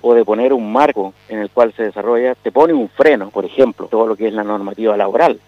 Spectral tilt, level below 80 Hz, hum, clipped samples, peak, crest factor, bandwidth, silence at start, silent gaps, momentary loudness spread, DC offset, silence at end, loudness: -7 dB/octave; -60 dBFS; 50 Hz at -55 dBFS; under 0.1%; 0 dBFS; 14 dB; 7.2 kHz; 0.05 s; none; 8 LU; under 0.1%; 0.1 s; -15 LUFS